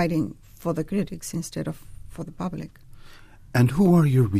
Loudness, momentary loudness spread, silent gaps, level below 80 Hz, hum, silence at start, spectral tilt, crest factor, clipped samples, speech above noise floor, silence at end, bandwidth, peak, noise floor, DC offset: -24 LUFS; 20 LU; none; -46 dBFS; none; 0 s; -7.5 dB/octave; 16 dB; under 0.1%; 23 dB; 0 s; 15.5 kHz; -8 dBFS; -45 dBFS; under 0.1%